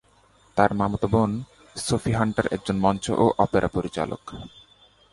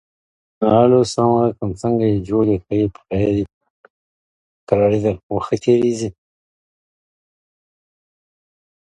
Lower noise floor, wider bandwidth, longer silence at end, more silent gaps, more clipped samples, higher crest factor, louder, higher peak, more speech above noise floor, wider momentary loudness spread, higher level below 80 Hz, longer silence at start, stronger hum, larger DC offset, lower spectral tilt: second, -58 dBFS vs under -90 dBFS; about the same, 11.5 kHz vs 11 kHz; second, 0.65 s vs 2.9 s; second, none vs 3.54-3.61 s, 3.70-3.84 s, 3.90-4.67 s, 5.23-5.29 s; neither; about the same, 22 dB vs 20 dB; second, -24 LUFS vs -18 LUFS; second, -4 dBFS vs 0 dBFS; second, 35 dB vs over 74 dB; first, 14 LU vs 9 LU; about the same, -46 dBFS vs -46 dBFS; about the same, 0.55 s vs 0.6 s; neither; neither; second, -6 dB/octave vs -7.5 dB/octave